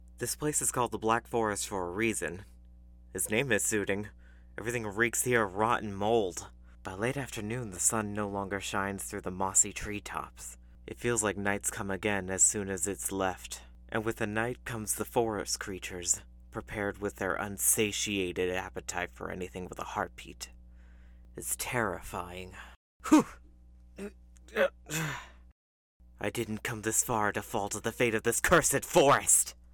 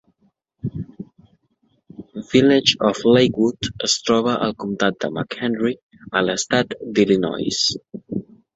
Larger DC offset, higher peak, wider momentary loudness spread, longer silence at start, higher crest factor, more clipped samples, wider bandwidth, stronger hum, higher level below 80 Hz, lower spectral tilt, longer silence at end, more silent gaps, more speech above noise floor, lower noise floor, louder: neither; second, -12 dBFS vs -2 dBFS; about the same, 18 LU vs 17 LU; second, 0 s vs 0.65 s; about the same, 20 dB vs 20 dB; neither; first, 19 kHz vs 8 kHz; neither; about the same, -52 dBFS vs -54 dBFS; about the same, -3 dB/octave vs -4 dB/octave; second, 0.2 s vs 0.35 s; first, 22.76-23.00 s, 25.52-26.00 s vs 5.83-5.89 s; second, 24 dB vs 46 dB; second, -55 dBFS vs -65 dBFS; second, -30 LUFS vs -19 LUFS